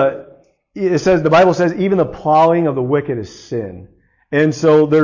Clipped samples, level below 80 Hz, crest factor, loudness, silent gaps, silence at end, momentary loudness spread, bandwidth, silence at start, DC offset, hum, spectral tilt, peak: under 0.1%; -48 dBFS; 12 dB; -15 LUFS; none; 0 s; 14 LU; 7.4 kHz; 0 s; under 0.1%; none; -7 dB/octave; -2 dBFS